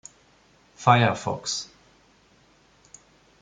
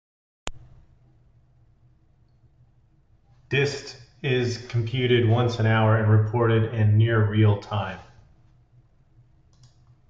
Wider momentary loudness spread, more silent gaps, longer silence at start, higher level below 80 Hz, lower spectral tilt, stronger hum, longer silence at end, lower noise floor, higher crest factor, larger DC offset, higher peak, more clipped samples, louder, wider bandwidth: second, 12 LU vs 19 LU; neither; first, 0.8 s vs 0.45 s; second, -64 dBFS vs -52 dBFS; second, -4.5 dB/octave vs -7 dB/octave; neither; second, 1.75 s vs 2.1 s; about the same, -59 dBFS vs -59 dBFS; first, 26 dB vs 16 dB; neither; first, -2 dBFS vs -8 dBFS; neither; about the same, -23 LUFS vs -22 LUFS; first, 9.4 kHz vs 7.6 kHz